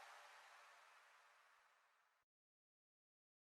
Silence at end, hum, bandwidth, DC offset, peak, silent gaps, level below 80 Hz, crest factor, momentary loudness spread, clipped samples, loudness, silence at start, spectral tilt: 1.3 s; none; 13 kHz; under 0.1%; -48 dBFS; none; under -90 dBFS; 22 dB; 7 LU; under 0.1%; -65 LUFS; 0 s; 2 dB/octave